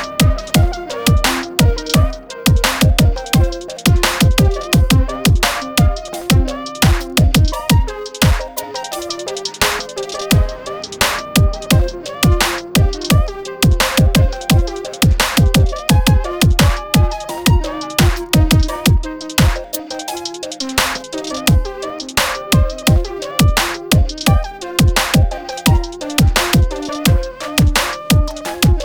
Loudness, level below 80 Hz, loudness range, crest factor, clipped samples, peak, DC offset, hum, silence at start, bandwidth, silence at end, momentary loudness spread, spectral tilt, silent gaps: -15 LUFS; -20 dBFS; 3 LU; 14 dB; under 0.1%; -2 dBFS; under 0.1%; none; 0 s; over 20 kHz; 0 s; 10 LU; -4.5 dB/octave; none